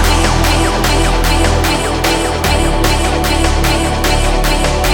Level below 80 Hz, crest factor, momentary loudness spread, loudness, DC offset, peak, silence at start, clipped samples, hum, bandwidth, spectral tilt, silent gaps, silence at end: -16 dBFS; 12 dB; 2 LU; -13 LUFS; under 0.1%; 0 dBFS; 0 s; under 0.1%; none; 18.5 kHz; -4 dB/octave; none; 0 s